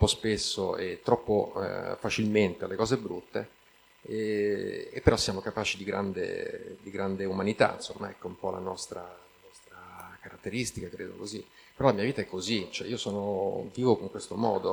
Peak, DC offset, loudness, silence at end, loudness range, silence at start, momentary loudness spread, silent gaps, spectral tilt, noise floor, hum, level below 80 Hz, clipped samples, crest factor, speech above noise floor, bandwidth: -6 dBFS; under 0.1%; -31 LUFS; 0 s; 6 LU; 0 s; 14 LU; none; -5 dB/octave; -55 dBFS; none; -50 dBFS; under 0.1%; 24 dB; 25 dB; 19 kHz